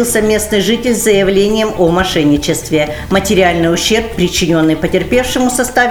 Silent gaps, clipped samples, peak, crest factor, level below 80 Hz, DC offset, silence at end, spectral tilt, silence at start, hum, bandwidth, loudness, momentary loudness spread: none; under 0.1%; 0 dBFS; 12 dB; -30 dBFS; 1%; 0 s; -4 dB/octave; 0 s; none; over 20 kHz; -12 LUFS; 4 LU